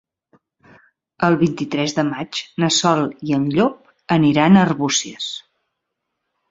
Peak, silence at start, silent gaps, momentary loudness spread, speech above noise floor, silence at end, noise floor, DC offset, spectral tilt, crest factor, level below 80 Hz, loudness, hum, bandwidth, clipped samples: -2 dBFS; 1.2 s; none; 13 LU; 60 dB; 1.1 s; -77 dBFS; under 0.1%; -4.5 dB/octave; 18 dB; -56 dBFS; -18 LUFS; none; 7.8 kHz; under 0.1%